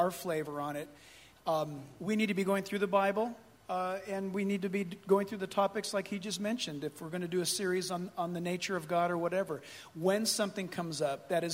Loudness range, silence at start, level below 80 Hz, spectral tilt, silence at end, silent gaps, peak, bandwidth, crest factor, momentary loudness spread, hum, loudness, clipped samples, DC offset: 1 LU; 0 s; -74 dBFS; -4.5 dB/octave; 0 s; none; -14 dBFS; 16 kHz; 20 dB; 9 LU; none; -34 LUFS; under 0.1%; under 0.1%